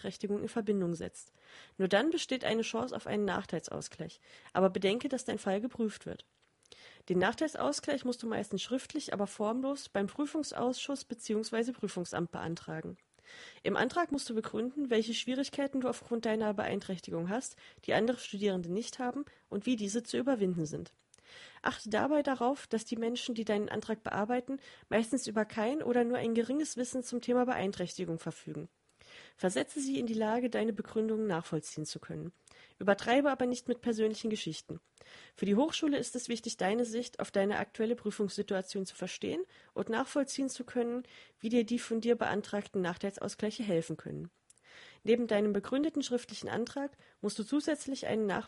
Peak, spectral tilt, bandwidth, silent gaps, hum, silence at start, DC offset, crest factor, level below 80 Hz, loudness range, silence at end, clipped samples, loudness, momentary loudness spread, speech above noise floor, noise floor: -14 dBFS; -4.5 dB/octave; 11.5 kHz; none; none; 0 s; under 0.1%; 22 dB; -70 dBFS; 3 LU; 0 s; under 0.1%; -34 LUFS; 12 LU; 26 dB; -60 dBFS